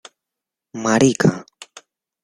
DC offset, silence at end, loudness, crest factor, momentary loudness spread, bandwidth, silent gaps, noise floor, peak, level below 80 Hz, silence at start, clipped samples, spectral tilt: under 0.1%; 0.8 s; -17 LUFS; 20 dB; 22 LU; 12.5 kHz; none; -85 dBFS; -2 dBFS; -56 dBFS; 0.75 s; under 0.1%; -5 dB/octave